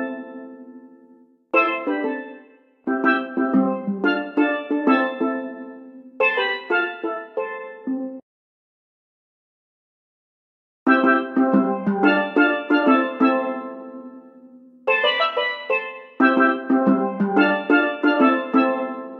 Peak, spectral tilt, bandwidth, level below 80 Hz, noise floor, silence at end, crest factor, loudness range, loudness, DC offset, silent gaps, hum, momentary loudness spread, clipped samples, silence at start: -2 dBFS; -7.5 dB/octave; 5.6 kHz; -80 dBFS; -52 dBFS; 0 s; 20 dB; 9 LU; -20 LUFS; under 0.1%; 8.22-10.86 s; none; 15 LU; under 0.1%; 0 s